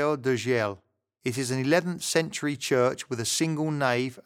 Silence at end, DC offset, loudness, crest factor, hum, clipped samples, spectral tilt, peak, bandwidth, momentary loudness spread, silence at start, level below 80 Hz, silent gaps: 0.05 s; under 0.1%; -27 LUFS; 18 dB; none; under 0.1%; -4.5 dB/octave; -10 dBFS; 17 kHz; 7 LU; 0 s; -70 dBFS; none